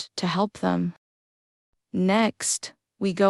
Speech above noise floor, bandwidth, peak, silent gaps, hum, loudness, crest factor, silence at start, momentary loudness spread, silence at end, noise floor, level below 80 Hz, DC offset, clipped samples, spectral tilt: over 66 dB; 13 kHz; -8 dBFS; 0.98-1.73 s; none; -26 LUFS; 18 dB; 0 s; 10 LU; 0 s; under -90 dBFS; -66 dBFS; under 0.1%; under 0.1%; -4.5 dB/octave